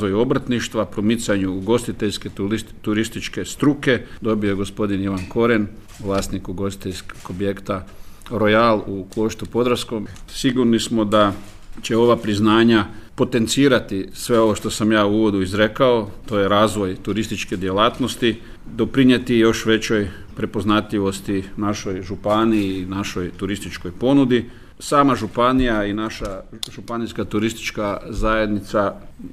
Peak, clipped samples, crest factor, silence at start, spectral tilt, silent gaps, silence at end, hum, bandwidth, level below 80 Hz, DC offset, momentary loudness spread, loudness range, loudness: -2 dBFS; under 0.1%; 18 dB; 0 s; -5.5 dB/octave; none; 0 s; none; 15 kHz; -38 dBFS; under 0.1%; 12 LU; 5 LU; -20 LUFS